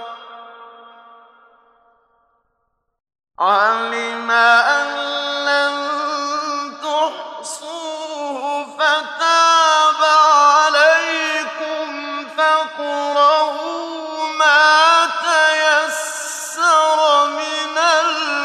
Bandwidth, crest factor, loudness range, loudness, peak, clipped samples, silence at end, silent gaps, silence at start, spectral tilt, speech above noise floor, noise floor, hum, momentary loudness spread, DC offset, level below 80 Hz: 13.5 kHz; 14 dB; 8 LU; -15 LUFS; -2 dBFS; under 0.1%; 0 s; none; 0 s; 0.5 dB/octave; 55 dB; -70 dBFS; none; 14 LU; under 0.1%; -80 dBFS